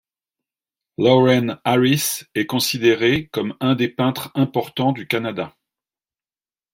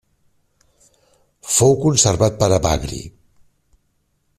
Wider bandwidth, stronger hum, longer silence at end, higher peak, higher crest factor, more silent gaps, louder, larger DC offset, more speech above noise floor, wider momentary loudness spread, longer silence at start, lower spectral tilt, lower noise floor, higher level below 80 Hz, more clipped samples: first, 16.5 kHz vs 14.5 kHz; neither; about the same, 1.25 s vs 1.3 s; about the same, -2 dBFS vs 0 dBFS; about the same, 18 dB vs 20 dB; neither; second, -19 LUFS vs -16 LUFS; neither; first, over 71 dB vs 50 dB; second, 9 LU vs 19 LU; second, 1 s vs 1.45 s; about the same, -5 dB/octave vs -4.5 dB/octave; first, under -90 dBFS vs -66 dBFS; second, -56 dBFS vs -40 dBFS; neither